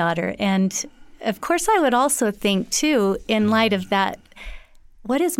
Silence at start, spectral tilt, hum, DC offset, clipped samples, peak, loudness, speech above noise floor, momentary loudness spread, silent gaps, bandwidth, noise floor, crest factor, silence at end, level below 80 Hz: 0 s; -4 dB/octave; none; under 0.1%; under 0.1%; -6 dBFS; -20 LUFS; 23 dB; 17 LU; none; 17 kHz; -43 dBFS; 14 dB; 0.05 s; -46 dBFS